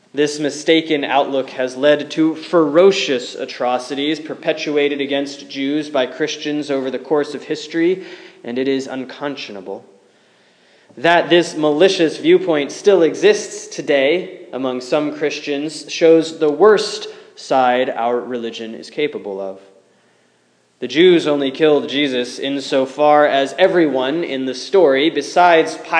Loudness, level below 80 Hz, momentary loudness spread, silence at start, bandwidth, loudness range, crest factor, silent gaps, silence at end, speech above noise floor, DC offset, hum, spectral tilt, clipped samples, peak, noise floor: -16 LUFS; -78 dBFS; 14 LU; 0.15 s; 10.5 kHz; 6 LU; 16 dB; none; 0 s; 42 dB; under 0.1%; none; -4.5 dB/octave; under 0.1%; 0 dBFS; -58 dBFS